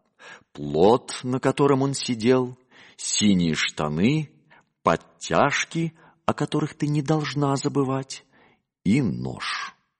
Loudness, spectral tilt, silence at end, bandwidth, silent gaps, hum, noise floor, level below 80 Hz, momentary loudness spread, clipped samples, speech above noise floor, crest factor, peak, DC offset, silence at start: -24 LUFS; -5 dB/octave; 0.3 s; 10 kHz; none; none; -60 dBFS; -56 dBFS; 10 LU; under 0.1%; 38 dB; 20 dB; -4 dBFS; under 0.1%; 0.2 s